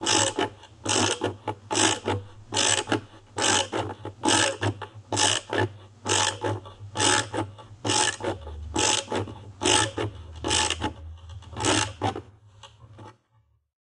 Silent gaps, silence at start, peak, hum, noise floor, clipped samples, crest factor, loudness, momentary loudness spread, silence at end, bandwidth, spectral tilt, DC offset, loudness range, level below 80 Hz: none; 0 s; -4 dBFS; none; -66 dBFS; under 0.1%; 22 dB; -25 LUFS; 14 LU; 0.8 s; 11.5 kHz; -2 dB/octave; under 0.1%; 2 LU; -50 dBFS